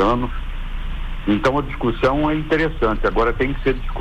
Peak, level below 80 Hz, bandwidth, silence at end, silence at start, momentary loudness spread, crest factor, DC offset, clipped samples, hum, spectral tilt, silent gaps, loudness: -6 dBFS; -26 dBFS; 7.8 kHz; 0 s; 0 s; 13 LU; 12 dB; under 0.1%; under 0.1%; none; -7 dB/octave; none; -20 LUFS